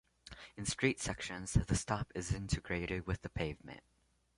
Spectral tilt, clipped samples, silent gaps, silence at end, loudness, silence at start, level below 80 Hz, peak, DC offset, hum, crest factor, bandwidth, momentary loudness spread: -4.5 dB/octave; under 0.1%; none; 0.6 s; -38 LUFS; 0.25 s; -48 dBFS; -16 dBFS; under 0.1%; none; 22 dB; 11.5 kHz; 18 LU